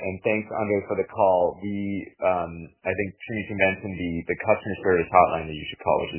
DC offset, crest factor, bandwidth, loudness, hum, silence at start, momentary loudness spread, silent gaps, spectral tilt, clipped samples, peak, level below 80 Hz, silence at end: under 0.1%; 24 dB; 3.2 kHz; -25 LUFS; none; 0 s; 11 LU; none; -10 dB/octave; under 0.1%; -2 dBFS; -50 dBFS; 0 s